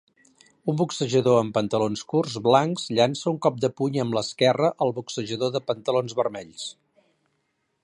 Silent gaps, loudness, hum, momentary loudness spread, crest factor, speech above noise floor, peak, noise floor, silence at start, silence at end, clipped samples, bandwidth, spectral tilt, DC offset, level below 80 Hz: none; -24 LUFS; none; 10 LU; 20 dB; 50 dB; -4 dBFS; -74 dBFS; 0.65 s; 1.1 s; under 0.1%; 11 kHz; -5.5 dB/octave; under 0.1%; -66 dBFS